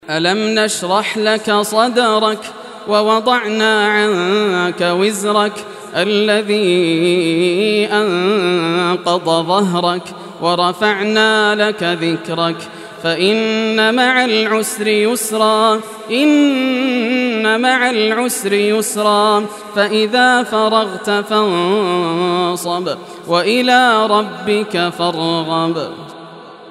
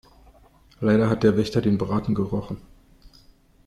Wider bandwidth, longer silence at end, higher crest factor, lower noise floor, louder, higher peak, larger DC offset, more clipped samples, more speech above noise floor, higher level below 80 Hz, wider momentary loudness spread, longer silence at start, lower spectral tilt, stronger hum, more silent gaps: first, 14.5 kHz vs 11 kHz; second, 0 s vs 1.05 s; second, 14 dB vs 20 dB; second, -35 dBFS vs -55 dBFS; first, -14 LUFS vs -23 LUFS; first, 0 dBFS vs -6 dBFS; neither; neither; second, 21 dB vs 33 dB; second, -66 dBFS vs -48 dBFS; second, 7 LU vs 10 LU; second, 0.05 s vs 0.8 s; second, -4 dB/octave vs -8 dB/octave; neither; neither